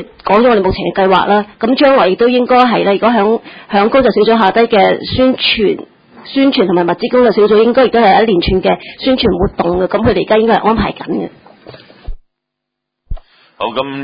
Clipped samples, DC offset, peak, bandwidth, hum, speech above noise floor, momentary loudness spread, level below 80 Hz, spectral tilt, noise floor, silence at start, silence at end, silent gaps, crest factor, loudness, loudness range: under 0.1%; under 0.1%; 0 dBFS; 5.2 kHz; none; 65 dB; 10 LU; -32 dBFS; -8.5 dB/octave; -76 dBFS; 0 s; 0 s; none; 12 dB; -11 LUFS; 5 LU